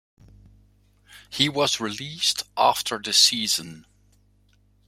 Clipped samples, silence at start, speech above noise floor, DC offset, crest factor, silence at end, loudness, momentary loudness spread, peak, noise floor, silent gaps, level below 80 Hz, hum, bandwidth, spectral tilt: under 0.1%; 1.1 s; 38 dB; under 0.1%; 24 dB; 1.1 s; -21 LUFS; 12 LU; -2 dBFS; -61 dBFS; none; -60 dBFS; 50 Hz at -55 dBFS; 16 kHz; -1.5 dB/octave